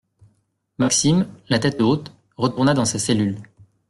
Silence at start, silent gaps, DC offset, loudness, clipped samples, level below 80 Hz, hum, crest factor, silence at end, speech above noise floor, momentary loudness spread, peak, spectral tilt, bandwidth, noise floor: 0.8 s; none; under 0.1%; -20 LUFS; under 0.1%; -54 dBFS; none; 16 dB; 0.45 s; 47 dB; 8 LU; -6 dBFS; -4.5 dB/octave; 12.5 kHz; -66 dBFS